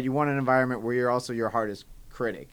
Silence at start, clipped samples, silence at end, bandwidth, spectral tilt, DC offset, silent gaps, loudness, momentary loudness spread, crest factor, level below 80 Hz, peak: 0 s; under 0.1%; 0.05 s; 20 kHz; -6.5 dB/octave; under 0.1%; none; -27 LUFS; 9 LU; 18 dB; -54 dBFS; -8 dBFS